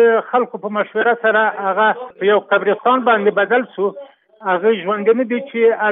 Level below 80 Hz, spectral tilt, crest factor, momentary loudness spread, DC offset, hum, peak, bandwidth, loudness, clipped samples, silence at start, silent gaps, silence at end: -82 dBFS; -9.5 dB/octave; 14 dB; 7 LU; under 0.1%; none; -2 dBFS; 3.9 kHz; -16 LUFS; under 0.1%; 0 s; none; 0 s